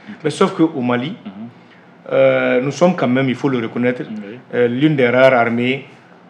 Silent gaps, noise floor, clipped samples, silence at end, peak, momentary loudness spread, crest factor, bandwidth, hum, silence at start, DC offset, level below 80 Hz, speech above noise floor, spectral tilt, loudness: none; -44 dBFS; under 0.1%; 0.45 s; 0 dBFS; 16 LU; 16 dB; 10.5 kHz; none; 0.05 s; under 0.1%; -74 dBFS; 29 dB; -6.5 dB/octave; -16 LUFS